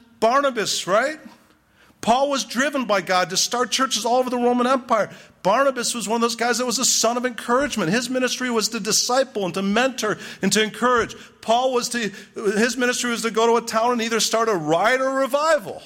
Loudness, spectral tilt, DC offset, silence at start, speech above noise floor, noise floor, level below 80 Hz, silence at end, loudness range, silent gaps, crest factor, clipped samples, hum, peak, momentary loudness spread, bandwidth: -20 LUFS; -2.5 dB/octave; under 0.1%; 0.2 s; 35 dB; -56 dBFS; -60 dBFS; 0 s; 2 LU; none; 14 dB; under 0.1%; none; -6 dBFS; 6 LU; 16.5 kHz